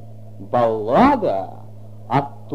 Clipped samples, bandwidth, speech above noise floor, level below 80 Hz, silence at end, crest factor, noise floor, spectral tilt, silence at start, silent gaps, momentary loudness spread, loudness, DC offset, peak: under 0.1%; 11.5 kHz; 21 dB; -46 dBFS; 0 s; 18 dB; -39 dBFS; -8 dB/octave; 0 s; none; 14 LU; -19 LUFS; 1%; -2 dBFS